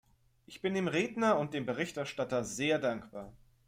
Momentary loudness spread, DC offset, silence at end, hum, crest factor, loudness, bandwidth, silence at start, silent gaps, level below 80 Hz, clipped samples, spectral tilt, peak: 18 LU; under 0.1%; 0.3 s; none; 20 dB; -33 LUFS; 16 kHz; 0.5 s; none; -66 dBFS; under 0.1%; -5 dB/octave; -16 dBFS